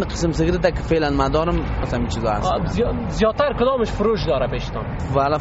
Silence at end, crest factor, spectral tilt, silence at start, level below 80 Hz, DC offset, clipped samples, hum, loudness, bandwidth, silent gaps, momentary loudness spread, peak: 0 s; 14 dB; -5.5 dB/octave; 0 s; -30 dBFS; under 0.1%; under 0.1%; none; -21 LUFS; 8 kHz; none; 5 LU; -6 dBFS